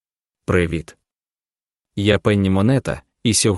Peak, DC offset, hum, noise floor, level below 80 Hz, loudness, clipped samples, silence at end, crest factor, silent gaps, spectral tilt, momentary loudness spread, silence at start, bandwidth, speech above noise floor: 0 dBFS; under 0.1%; none; under -90 dBFS; -42 dBFS; -19 LUFS; under 0.1%; 0 s; 20 dB; none; -5 dB/octave; 12 LU; 0.5 s; 12 kHz; over 73 dB